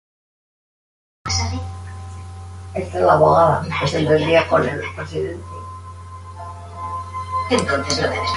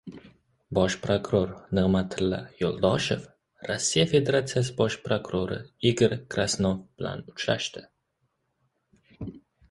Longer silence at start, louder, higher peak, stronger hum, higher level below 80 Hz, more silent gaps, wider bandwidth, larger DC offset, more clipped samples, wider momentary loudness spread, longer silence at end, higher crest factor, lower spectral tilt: first, 1.25 s vs 0.05 s; first, -19 LUFS vs -27 LUFS; first, -2 dBFS vs -8 dBFS; neither; first, -38 dBFS vs -50 dBFS; neither; about the same, 11.5 kHz vs 11.5 kHz; neither; neither; first, 20 LU vs 12 LU; second, 0 s vs 0.3 s; about the same, 18 dB vs 20 dB; about the same, -5 dB/octave vs -5 dB/octave